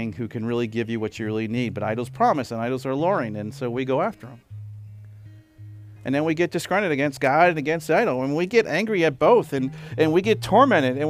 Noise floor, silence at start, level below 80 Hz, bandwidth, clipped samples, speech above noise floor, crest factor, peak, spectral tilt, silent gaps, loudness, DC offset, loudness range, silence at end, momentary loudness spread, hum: -45 dBFS; 0 s; -58 dBFS; 16 kHz; under 0.1%; 23 dB; 18 dB; -4 dBFS; -6.5 dB/octave; none; -22 LUFS; under 0.1%; 7 LU; 0 s; 12 LU; none